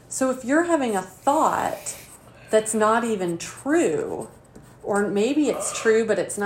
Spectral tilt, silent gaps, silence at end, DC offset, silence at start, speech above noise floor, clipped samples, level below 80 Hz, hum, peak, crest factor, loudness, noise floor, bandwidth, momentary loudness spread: -4 dB/octave; none; 0 s; under 0.1%; 0.1 s; 24 dB; under 0.1%; -60 dBFS; none; -6 dBFS; 16 dB; -23 LUFS; -46 dBFS; 16 kHz; 11 LU